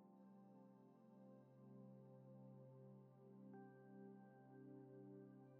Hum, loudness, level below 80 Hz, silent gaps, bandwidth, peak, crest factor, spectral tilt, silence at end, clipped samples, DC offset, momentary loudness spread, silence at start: none; -65 LUFS; under -90 dBFS; none; 2.8 kHz; -50 dBFS; 14 dB; -7.5 dB/octave; 0 s; under 0.1%; under 0.1%; 5 LU; 0 s